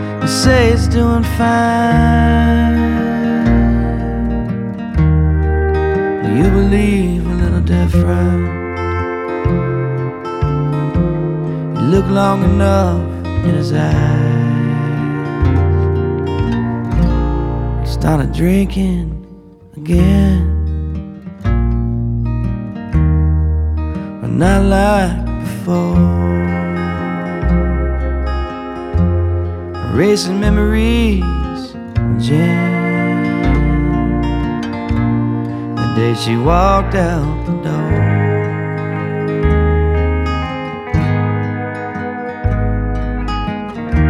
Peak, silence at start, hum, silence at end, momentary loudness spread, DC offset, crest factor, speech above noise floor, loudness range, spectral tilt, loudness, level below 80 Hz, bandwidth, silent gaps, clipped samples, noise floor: -2 dBFS; 0 s; none; 0 s; 8 LU; under 0.1%; 12 dB; 26 dB; 3 LU; -7.5 dB/octave; -15 LUFS; -20 dBFS; 14 kHz; none; under 0.1%; -38 dBFS